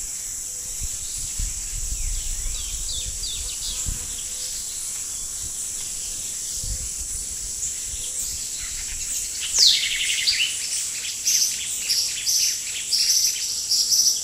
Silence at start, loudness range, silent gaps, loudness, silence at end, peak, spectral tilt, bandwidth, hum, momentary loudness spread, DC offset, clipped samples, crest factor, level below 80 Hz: 0 s; 7 LU; none; -22 LUFS; 0 s; -2 dBFS; 1.5 dB/octave; 16 kHz; none; 10 LU; under 0.1%; under 0.1%; 22 dB; -38 dBFS